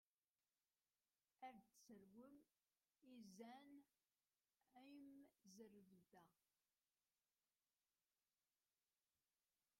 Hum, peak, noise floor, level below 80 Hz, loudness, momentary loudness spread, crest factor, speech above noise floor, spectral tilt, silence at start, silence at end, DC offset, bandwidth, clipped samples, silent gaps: none; -50 dBFS; under -90 dBFS; under -90 dBFS; -66 LUFS; 6 LU; 22 dB; over 24 dB; -4.5 dB/octave; 1.4 s; 3.45 s; under 0.1%; 16 kHz; under 0.1%; none